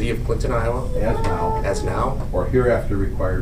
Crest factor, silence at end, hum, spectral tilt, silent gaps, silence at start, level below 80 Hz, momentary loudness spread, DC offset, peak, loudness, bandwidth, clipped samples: 14 dB; 0 s; none; -7 dB/octave; none; 0 s; -24 dBFS; 5 LU; under 0.1%; -6 dBFS; -22 LUFS; 15 kHz; under 0.1%